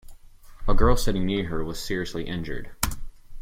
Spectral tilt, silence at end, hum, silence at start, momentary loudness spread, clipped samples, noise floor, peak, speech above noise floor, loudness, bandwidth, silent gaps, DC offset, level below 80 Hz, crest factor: -5 dB/octave; 0 s; none; 0.1 s; 11 LU; under 0.1%; -45 dBFS; -6 dBFS; 22 dB; -28 LUFS; 15.5 kHz; none; under 0.1%; -28 dBFS; 18 dB